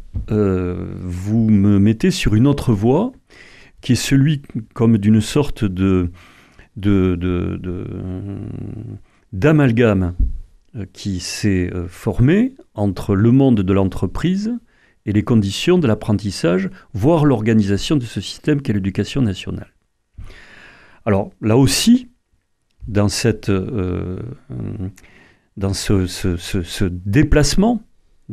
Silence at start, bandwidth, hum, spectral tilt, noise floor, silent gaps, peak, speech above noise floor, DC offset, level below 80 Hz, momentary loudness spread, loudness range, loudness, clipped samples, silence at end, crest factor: 0 s; 14.5 kHz; none; -6.5 dB/octave; -63 dBFS; none; -2 dBFS; 47 dB; under 0.1%; -32 dBFS; 15 LU; 6 LU; -18 LUFS; under 0.1%; 0 s; 16 dB